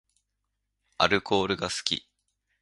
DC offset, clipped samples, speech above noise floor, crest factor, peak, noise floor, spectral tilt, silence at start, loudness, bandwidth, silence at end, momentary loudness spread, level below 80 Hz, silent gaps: under 0.1%; under 0.1%; 54 dB; 26 dB; -4 dBFS; -81 dBFS; -3 dB/octave; 1 s; -27 LUFS; 11.5 kHz; 0.65 s; 6 LU; -58 dBFS; none